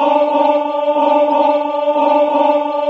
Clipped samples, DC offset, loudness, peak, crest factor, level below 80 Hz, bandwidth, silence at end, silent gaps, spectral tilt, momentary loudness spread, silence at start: under 0.1%; under 0.1%; -14 LUFS; -2 dBFS; 12 dB; -72 dBFS; 6 kHz; 0 s; none; -5 dB/octave; 3 LU; 0 s